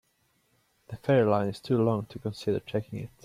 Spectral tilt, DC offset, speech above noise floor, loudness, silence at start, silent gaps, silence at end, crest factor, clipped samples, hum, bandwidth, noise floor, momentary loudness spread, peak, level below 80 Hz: -8 dB/octave; under 0.1%; 43 dB; -28 LUFS; 0.9 s; none; 0.15 s; 18 dB; under 0.1%; none; 15 kHz; -71 dBFS; 13 LU; -10 dBFS; -64 dBFS